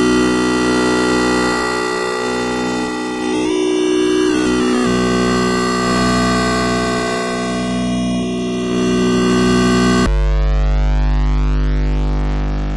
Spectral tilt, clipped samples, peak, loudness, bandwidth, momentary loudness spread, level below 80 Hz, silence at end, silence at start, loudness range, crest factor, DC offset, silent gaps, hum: -5 dB/octave; under 0.1%; -4 dBFS; -16 LUFS; 11.5 kHz; 6 LU; -22 dBFS; 0 s; 0 s; 2 LU; 10 dB; under 0.1%; none; none